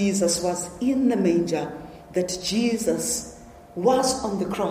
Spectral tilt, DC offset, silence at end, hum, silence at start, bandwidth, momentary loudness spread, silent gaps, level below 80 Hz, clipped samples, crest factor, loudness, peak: -4.5 dB/octave; under 0.1%; 0 s; none; 0 s; 15.5 kHz; 9 LU; none; -52 dBFS; under 0.1%; 16 dB; -24 LUFS; -8 dBFS